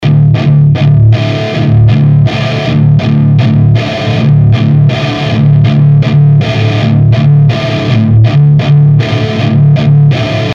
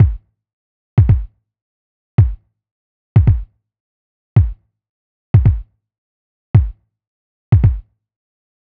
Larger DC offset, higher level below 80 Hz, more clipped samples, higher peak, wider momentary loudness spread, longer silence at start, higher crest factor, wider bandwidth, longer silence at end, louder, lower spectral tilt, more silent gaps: neither; second, -30 dBFS vs -24 dBFS; neither; about the same, 0 dBFS vs 0 dBFS; second, 5 LU vs 13 LU; about the same, 0 s vs 0 s; second, 6 dB vs 16 dB; first, 6.8 kHz vs 3.3 kHz; second, 0 s vs 0.9 s; first, -7 LUFS vs -16 LUFS; second, -8.5 dB/octave vs -12 dB/octave; second, none vs 0.53-0.97 s, 1.62-2.18 s, 2.71-3.15 s, 3.80-4.36 s, 4.89-5.34 s, 5.98-6.54 s, 7.07-7.52 s